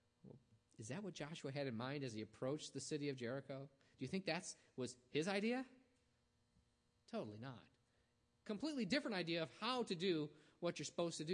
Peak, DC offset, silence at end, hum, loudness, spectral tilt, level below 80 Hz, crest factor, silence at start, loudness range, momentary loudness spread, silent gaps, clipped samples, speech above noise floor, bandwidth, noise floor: -26 dBFS; under 0.1%; 0 s; none; -46 LUFS; -4.5 dB/octave; -84 dBFS; 20 dB; 0.25 s; 5 LU; 14 LU; none; under 0.1%; 36 dB; 10 kHz; -81 dBFS